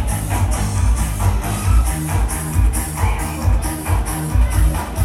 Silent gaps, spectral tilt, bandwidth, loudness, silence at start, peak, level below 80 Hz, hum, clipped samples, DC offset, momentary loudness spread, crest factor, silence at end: none; -5 dB/octave; 15.5 kHz; -19 LUFS; 0 s; -4 dBFS; -18 dBFS; none; under 0.1%; under 0.1%; 3 LU; 12 dB; 0 s